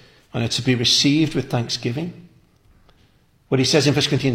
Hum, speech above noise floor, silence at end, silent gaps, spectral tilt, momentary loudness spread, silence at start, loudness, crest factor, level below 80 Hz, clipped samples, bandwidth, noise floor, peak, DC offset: none; 38 dB; 0 s; none; -4.5 dB/octave; 12 LU; 0.35 s; -19 LUFS; 18 dB; -50 dBFS; under 0.1%; 16 kHz; -57 dBFS; -4 dBFS; under 0.1%